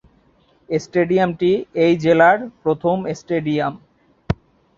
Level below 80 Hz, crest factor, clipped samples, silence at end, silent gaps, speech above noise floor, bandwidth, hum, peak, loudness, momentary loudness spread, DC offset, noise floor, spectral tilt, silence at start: -46 dBFS; 18 dB; under 0.1%; 0.45 s; none; 40 dB; 7.4 kHz; none; -2 dBFS; -19 LUFS; 13 LU; under 0.1%; -57 dBFS; -7 dB/octave; 0.7 s